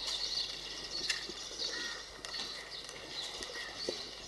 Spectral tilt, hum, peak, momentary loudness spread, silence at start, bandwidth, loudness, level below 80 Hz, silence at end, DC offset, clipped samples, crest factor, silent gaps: -0.5 dB/octave; none; -18 dBFS; 8 LU; 0 s; 12 kHz; -38 LUFS; -62 dBFS; 0 s; under 0.1%; under 0.1%; 24 dB; none